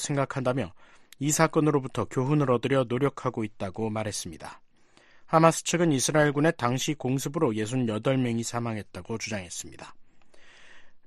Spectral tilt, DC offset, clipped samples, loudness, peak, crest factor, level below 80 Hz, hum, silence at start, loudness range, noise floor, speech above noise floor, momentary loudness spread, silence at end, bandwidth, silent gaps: -5 dB/octave; under 0.1%; under 0.1%; -27 LUFS; -4 dBFS; 22 dB; -58 dBFS; none; 0 s; 5 LU; -58 dBFS; 31 dB; 14 LU; 0.1 s; 13 kHz; none